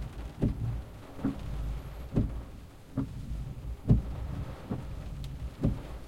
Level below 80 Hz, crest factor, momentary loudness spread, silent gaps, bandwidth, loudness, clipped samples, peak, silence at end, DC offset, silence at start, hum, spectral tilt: -38 dBFS; 22 dB; 13 LU; none; 15 kHz; -35 LUFS; under 0.1%; -12 dBFS; 0 s; under 0.1%; 0 s; none; -8.5 dB/octave